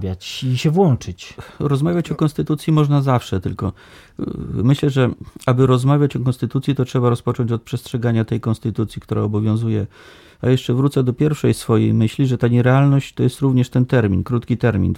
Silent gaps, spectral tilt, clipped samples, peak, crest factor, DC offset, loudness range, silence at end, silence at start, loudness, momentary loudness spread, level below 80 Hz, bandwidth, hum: none; -7.5 dB/octave; under 0.1%; -2 dBFS; 16 dB; under 0.1%; 4 LU; 0 s; 0 s; -18 LUFS; 10 LU; -44 dBFS; 14 kHz; none